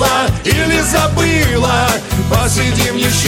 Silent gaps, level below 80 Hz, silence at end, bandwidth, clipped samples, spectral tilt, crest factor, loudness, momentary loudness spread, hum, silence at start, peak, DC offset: none; -24 dBFS; 0 s; 17 kHz; under 0.1%; -4 dB/octave; 12 dB; -13 LUFS; 2 LU; none; 0 s; 0 dBFS; under 0.1%